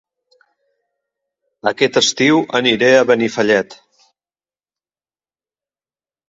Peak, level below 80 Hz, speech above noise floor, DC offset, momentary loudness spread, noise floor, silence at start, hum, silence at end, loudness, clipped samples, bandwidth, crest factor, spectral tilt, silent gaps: 0 dBFS; -62 dBFS; over 76 dB; under 0.1%; 9 LU; under -90 dBFS; 1.65 s; none; 2.55 s; -14 LUFS; under 0.1%; 7.8 kHz; 18 dB; -3.5 dB/octave; none